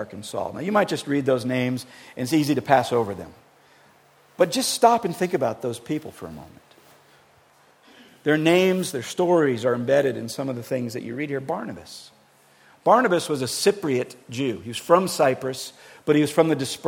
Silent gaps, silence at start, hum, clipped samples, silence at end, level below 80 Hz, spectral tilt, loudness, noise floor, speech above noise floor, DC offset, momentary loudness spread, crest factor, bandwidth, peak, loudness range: none; 0 s; none; under 0.1%; 0 s; -66 dBFS; -5 dB/octave; -23 LUFS; -57 dBFS; 34 dB; under 0.1%; 14 LU; 22 dB; 18 kHz; -2 dBFS; 4 LU